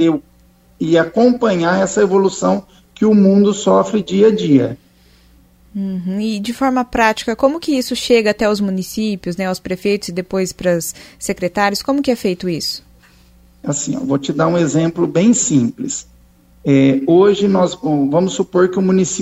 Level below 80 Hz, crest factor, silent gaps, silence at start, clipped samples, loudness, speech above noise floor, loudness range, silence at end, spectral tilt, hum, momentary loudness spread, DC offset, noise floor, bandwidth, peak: -48 dBFS; 16 dB; none; 0 s; under 0.1%; -15 LUFS; 35 dB; 5 LU; 0 s; -5 dB/octave; none; 10 LU; under 0.1%; -50 dBFS; 16 kHz; 0 dBFS